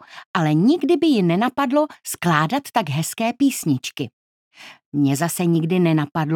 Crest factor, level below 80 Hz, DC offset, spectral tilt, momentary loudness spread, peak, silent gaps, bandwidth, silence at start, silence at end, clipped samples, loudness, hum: 18 dB; -68 dBFS; under 0.1%; -5.5 dB/octave; 8 LU; -2 dBFS; 0.26-0.34 s, 4.13-4.51 s, 4.86-4.92 s; 18.5 kHz; 0.1 s; 0 s; under 0.1%; -20 LUFS; none